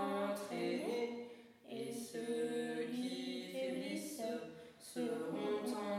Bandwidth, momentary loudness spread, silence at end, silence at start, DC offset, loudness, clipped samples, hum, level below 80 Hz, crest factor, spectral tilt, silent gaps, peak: 16 kHz; 10 LU; 0 s; 0 s; under 0.1%; -42 LUFS; under 0.1%; none; -86 dBFS; 14 dB; -4.5 dB/octave; none; -28 dBFS